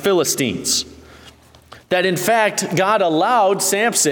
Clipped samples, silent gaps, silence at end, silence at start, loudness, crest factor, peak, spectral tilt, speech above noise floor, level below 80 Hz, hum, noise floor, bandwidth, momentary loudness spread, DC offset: under 0.1%; none; 0 s; 0 s; -17 LUFS; 16 dB; -2 dBFS; -2.5 dB/octave; 29 dB; -56 dBFS; none; -45 dBFS; 19 kHz; 4 LU; under 0.1%